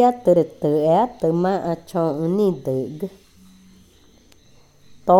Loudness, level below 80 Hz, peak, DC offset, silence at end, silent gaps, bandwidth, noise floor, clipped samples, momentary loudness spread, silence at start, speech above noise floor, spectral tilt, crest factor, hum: -20 LUFS; -58 dBFS; -2 dBFS; under 0.1%; 0 s; none; 16.5 kHz; -52 dBFS; under 0.1%; 11 LU; 0 s; 33 dB; -8.5 dB/octave; 18 dB; none